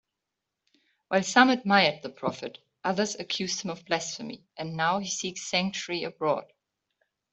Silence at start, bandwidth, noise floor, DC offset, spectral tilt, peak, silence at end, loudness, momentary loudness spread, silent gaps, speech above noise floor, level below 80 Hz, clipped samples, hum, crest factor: 1.1 s; 8.2 kHz; -86 dBFS; under 0.1%; -3.5 dB/octave; -4 dBFS; 0.9 s; -27 LUFS; 15 LU; none; 58 dB; -72 dBFS; under 0.1%; none; 26 dB